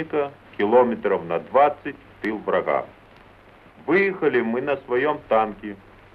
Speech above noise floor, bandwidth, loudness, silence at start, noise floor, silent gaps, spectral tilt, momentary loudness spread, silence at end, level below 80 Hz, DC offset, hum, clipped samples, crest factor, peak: 28 dB; 5.4 kHz; -22 LUFS; 0 s; -50 dBFS; none; -8 dB/octave; 17 LU; 0.4 s; -58 dBFS; under 0.1%; none; under 0.1%; 18 dB; -6 dBFS